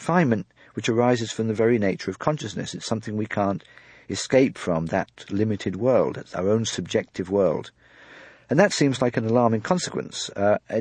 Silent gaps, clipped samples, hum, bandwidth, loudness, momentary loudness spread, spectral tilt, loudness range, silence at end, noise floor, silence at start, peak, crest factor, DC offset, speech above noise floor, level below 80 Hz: none; under 0.1%; none; 9.8 kHz; -24 LUFS; 9 LU; -5.5 dB/octave; 2 LU; 0 s; -48 dBFS; 0 s; -2 dBFS; 20 dB; under 0.1%; 25 dB; -58 dBFS